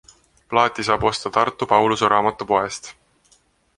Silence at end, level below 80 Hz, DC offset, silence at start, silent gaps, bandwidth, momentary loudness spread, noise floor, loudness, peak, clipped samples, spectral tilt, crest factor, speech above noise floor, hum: 0.85 s; -50 dBFS; under 0.1%; 0.5 s; none; 11.5 kHz; 8 LU; -60 dBFS; -19 LUFS; -2 dBFS; under 0.1%; -4 dB/octave; 20 dB; 40 dB; none